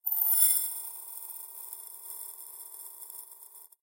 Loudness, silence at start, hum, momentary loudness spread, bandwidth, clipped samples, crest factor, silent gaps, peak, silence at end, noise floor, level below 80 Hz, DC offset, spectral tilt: -26 LUFS; 0.05 s; none; 22 LU; 17 kHz; under 0.1%; 26 dB; none; -8 dBFS; 0.15 s; -52 dBFS; under -90 dBFS; under 0.1%; 5 dB/octave